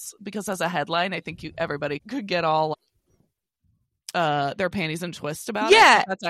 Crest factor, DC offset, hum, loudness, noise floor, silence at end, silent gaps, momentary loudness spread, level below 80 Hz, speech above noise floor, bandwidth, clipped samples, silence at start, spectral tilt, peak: 20 dB; under 0.1%; none; -22 LUFS; -70 dBFS; 0 s; none; 17 LU; -60 dBFS; 47 dB; 16 kHz; under 0.1%; 0 s; -3.5 dB/octave; -4 dBFS